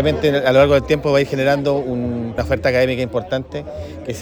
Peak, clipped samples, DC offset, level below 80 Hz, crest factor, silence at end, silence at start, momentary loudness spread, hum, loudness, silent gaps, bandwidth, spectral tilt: -2 dBFS; under 0.1%; under 0.1%; -38 dBFS; 16 dB; 0 s; 0 s; 15 LU; none; -17 LUFS; none; 19.5 kHz; -6.5 dB/octave